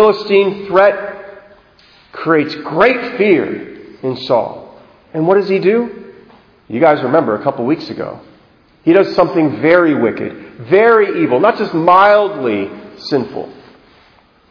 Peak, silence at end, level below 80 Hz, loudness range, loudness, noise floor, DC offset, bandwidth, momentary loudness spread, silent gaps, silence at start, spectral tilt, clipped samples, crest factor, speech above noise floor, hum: 0 dBFS; 1 s; -54 dBFS; 5 LU; -13 LUFS; -49 dBFS; under 0.1%; 5.4 kHz; 17 LU; none; 0 s; -8 dB/octave; 0.1%; 14 dB; 36 dB; none